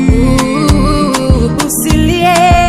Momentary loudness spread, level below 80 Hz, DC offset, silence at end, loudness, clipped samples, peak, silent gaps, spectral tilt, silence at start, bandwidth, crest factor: 3 LU; -16 dBFS; under 0.1%; 0 s; -10 LUFS; 0.9%; 0 dBFS; none; -5.5 dB/octave; 0 s; 16 kHz; 8 dB